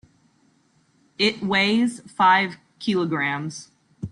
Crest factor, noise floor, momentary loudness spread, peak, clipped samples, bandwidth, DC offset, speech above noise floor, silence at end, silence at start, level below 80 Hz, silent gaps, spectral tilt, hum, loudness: 18 dB; -62 dBFS; 14 LU; -6 dBFS; under 0.1%; 11 kHz; under 0.1%; 41 dB; 0.05 s; 1.2 s; -60 dBFS; none; -4.5 dB/octave; none; -21 LUFS